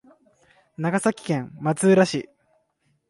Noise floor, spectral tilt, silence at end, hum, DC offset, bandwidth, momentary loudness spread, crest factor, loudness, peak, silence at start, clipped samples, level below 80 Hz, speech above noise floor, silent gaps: -69 dBFS; -5.5 dB/octave; 0.85 s; none; under 0.1%; 11.5 kHz; 11 LU; 18 dB; -22 LUFS; -6 dBFS; 0.8 s; under 0.1%; -66 dBFS; 48 dB; none